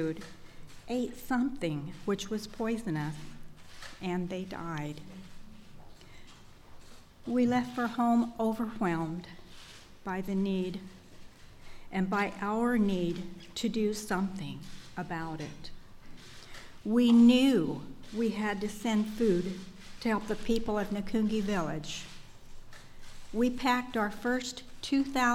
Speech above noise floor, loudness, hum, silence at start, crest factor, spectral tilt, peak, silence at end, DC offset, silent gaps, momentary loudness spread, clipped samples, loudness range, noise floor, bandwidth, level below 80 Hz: 21 dB; -31 LUFS; none; 0 s; 20 dB; -5.5 dB/octave; -12 dBFS; 0 s; under 0.1%; none; 20 LU; under 0.1%; 10 LU; -51 dBFS; 15 kHz; -52 dBFS